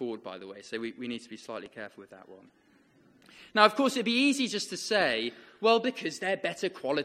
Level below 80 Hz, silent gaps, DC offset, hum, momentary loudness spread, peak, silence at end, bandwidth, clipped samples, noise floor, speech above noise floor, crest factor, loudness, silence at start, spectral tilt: -76 dBFS; none; under 0.1%; none; 18 LU; -4 dBFS; 0 s; 14.5 kHz; under 0.1%; -62 dBFS; 32 dB; 26 dB; -28 LUFS; 0 s; -3 dB/octave